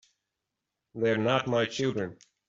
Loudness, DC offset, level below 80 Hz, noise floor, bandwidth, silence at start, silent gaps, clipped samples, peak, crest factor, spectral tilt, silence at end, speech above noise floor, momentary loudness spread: -29 LUFS; under 0.1%; -68 dBFS; -86 dBFS; 8 kHz; 0.95 s; none; under 0.1%; -10 dBFS; 20 dB; -5.5 dB/octave; 0.35 s; 58 dB; 11 LU